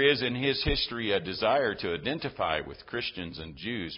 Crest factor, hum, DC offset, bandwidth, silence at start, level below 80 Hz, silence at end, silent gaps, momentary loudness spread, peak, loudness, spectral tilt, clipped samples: 18 dB; none; under 0.1%; 5.6 kHz; 0 s; -46 dBFS; 0 s; none; 10 LU; -12 dBFS; -30 LUFS; -8.5 dB/octave; under 0.1%